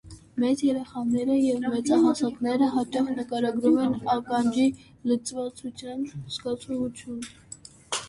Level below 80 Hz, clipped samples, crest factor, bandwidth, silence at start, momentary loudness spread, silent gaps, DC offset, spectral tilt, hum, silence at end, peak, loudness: -60 dBFS; under 0.1%; 16 dB; 11.5 kHz; 0.05 s; 14 LU; none; under 0.1%; -5 dB/octave; none; 0 s; -10 dBFS; -26 LUFS